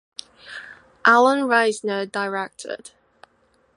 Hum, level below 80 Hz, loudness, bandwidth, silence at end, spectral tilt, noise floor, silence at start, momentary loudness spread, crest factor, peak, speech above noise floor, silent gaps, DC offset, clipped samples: none; -72 dBFS; -19 LUFS; 11.5 kHz; 0.9 s; -3.5 dB/octave; -62 dBFS; 0.45 s; 22 LU; 20 dB; -2 dBFS; 42 dB; none; under 0.1%; under 0.1%